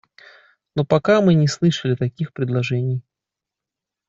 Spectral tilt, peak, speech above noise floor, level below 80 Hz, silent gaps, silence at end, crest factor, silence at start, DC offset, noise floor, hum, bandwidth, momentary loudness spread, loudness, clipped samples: -7 dB/octave; -4 dBFS; 68 dB; -56 dBFS; none; 1.1 s; 18 dB; 0.75 s; under 0.1%; -86 dBFS; none; 8 kHz; 11 LU; -20 LUFS; under 0.1%